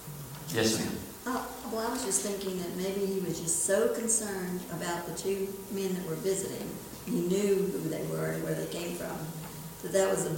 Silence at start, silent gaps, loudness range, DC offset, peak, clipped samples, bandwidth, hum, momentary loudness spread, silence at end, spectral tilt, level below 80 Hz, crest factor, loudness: 0 s; none; 3 LU; under 0.1%; -14 dBFS; under 0.1%; 17 kHz; none; 10 LU; 0 s; -4 dB/octave; -60 dBFS; 18 dB; -32 LUFS